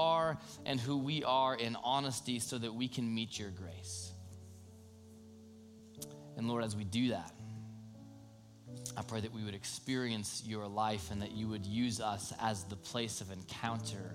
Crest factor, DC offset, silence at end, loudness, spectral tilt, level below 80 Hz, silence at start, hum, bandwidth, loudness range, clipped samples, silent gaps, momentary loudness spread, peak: 20 dB; under 0.1%; 0 s; -38 LUFS; -4.5 dB/octave; -70 dBFS; 0 s; none; 16.5 kHz; 7 LU; under 0.1%; none; 21 LU; -20 dBFS